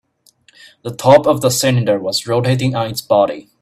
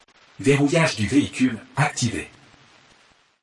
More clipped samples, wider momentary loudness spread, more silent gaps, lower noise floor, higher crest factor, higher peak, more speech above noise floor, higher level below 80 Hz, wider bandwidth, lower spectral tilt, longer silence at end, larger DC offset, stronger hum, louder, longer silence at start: neither; about the same, 9 LU vs 8 LU; neither; second, -54 dBFS vs -58 dBFS; about the same, 16 dB vs 18 dB; first, 0 dBFS vs -6 dBFS; about the same, 39 dB vs 37 dB; about the same, -52 dBFS vs -56 dBFS; first, 16 kHz vs 11.5 kHz; about the same, -5 dB/octave vs -5 dB/octave; second, 0.2 s vs 1.15 s; neither; neither; first, -15 LUFS vs -21 LUFS; first, 0.85 s vs 0.4 s